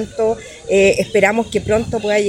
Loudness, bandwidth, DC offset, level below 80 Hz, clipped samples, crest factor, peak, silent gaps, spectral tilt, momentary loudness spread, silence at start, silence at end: -16 LUFS; 14.5 kHz; under 0.1%; -40 dBFS; under 0.1%; 16 dB; 0 dBFS; none; -4.5 dB/octave; 6 LU; 0 s; 0 s